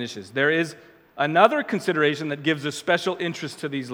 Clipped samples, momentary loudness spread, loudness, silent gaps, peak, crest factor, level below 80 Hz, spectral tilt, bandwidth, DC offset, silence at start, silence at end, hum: under 0.1%; 12 LU; -23 LUFS; none; 0 dBFS; 24 dB; -74 dBFS; -5 dB/octave; 18 kHz; under 0.1%; 0 s; 0 s; none